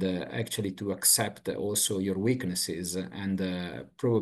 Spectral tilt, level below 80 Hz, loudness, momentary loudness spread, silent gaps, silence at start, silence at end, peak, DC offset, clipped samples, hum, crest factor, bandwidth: -3.5 dB/octave; -66 dBFS; -29 LUFS; 11 LU; none; 0 s; 0 s; -8 dBFS; under 0.1%; under 0.1%; none; 20 dB; 13 kHz